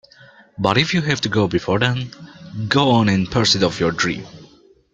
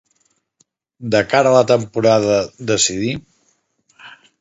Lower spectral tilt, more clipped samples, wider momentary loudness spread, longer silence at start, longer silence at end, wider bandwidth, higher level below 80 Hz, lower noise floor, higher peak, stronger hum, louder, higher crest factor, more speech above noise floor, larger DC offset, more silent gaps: about the same, -5 dB/octave vs -4 dB/octave; neither; first, 14 LU vs 11 LU; second, 0.6 s vs 1 s; first, 0.5 s vs 0.25 s; first, 9.2 kHz vs 8 kHz; about the same, -48 dBFS vs -52 dBFS; second, -50 dBFS vs -64 dBFS; about the same, -2 dBFS vs 0 dBFS; neither; about the same, -18 LUFS vs -16 LUFS; about the same, 18 dB vs 18 dB; second, 32 dB vs 48 dB; neither; neither